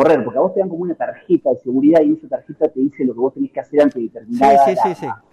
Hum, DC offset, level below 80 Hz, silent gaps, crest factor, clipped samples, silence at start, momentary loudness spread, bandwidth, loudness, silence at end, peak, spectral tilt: none; under 0.1%; -58 dBFS; none; 12 dB; under 0.1%; 0 s; 12 LU; 12 kHz; -16 LUFS; 0.15 s; -4 dBFS; -7.5 dB/octave